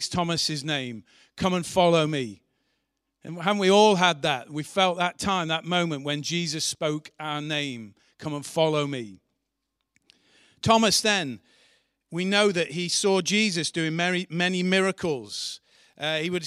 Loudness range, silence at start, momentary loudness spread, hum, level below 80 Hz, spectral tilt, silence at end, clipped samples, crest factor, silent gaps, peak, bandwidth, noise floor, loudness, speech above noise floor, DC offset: 5 LU; 0 s; 14 LU; none; -62 dBFS; -4 dB/octave; 0 s; under 0.1%; 22 dB; none; -4 dBFS; 15 kHz; -81 dBFS; -24 LUFS; 56 dB; under 0.1%